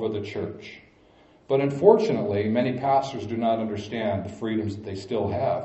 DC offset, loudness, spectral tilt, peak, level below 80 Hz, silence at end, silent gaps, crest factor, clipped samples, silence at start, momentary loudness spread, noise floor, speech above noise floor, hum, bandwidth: under 0.1%; -25 LUFS; -7.5 dB/octave; -2 dBFS; -60 dBFS; 0 s; none; 22 dB; under 0.1%; 0 s; 14 LU; -56 dBFS; 31 dB; none; 8.2 kHz